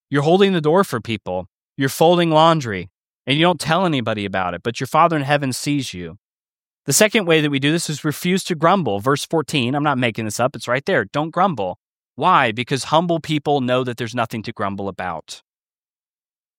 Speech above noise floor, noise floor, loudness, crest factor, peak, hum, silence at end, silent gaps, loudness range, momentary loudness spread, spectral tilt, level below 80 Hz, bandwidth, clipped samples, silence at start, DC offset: over 72 dB; under -90 dBFS; -19 LUFS; 18 dB; 0 dBFS; none; 1.2 s; 1.53-1.73 s, 2.98-3.09 s, 3.19-3.25 s, 6.20-6.45 s, 6.51-6.84 s, 11.80-12.10 s; 3 LU; 13 LU; -4.5 dB/octave; -60 dBFS; 16.5 kHz; under 0.1%; 0.1 s; under 0.1%